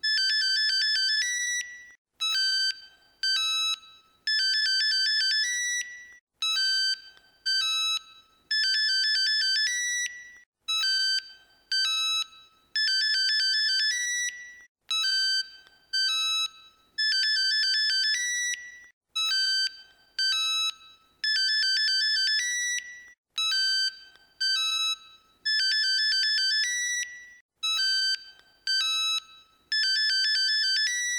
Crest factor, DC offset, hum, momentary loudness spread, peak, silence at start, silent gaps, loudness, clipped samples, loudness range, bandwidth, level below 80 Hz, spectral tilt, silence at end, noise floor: 12 dB; under 0.1%; none; 10 LU; -16 dBFS; 0.05 s; 1.98-2.05 s, 6.21-6.27 s, 10.46-10.52 s, 14.69-14.75 s, 18.93-19.01 s, 23.18-23.24 s, 27.41-27.49 s; -24 LUFS; under 0.1%; 2 LU; 19 kHz; -78 dBFS; 6 dB/octave; 0 s; -55 dBFS